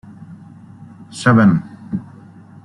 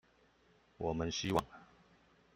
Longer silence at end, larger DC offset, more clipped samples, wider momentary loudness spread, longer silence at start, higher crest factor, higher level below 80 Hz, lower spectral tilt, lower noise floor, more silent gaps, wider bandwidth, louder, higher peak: about the same, 0.65 s vs 0.7 s; neither; neither; first, 27 LU vs 21 LU; second, 0.3 s vs 0.8 s; second, 18 dB vs 26 dB; first, -54 dBFS vs -60 dBFS; first, -7 dB/octave vs -4.5 dB/octave; second, -41 dBFS vs -70 dBFS; neither; second, 11.5 kHz vs 15.5 kHz; first, -16 LUFS vs -38 LUFS; first, -2 dBFS vs -16 dBFS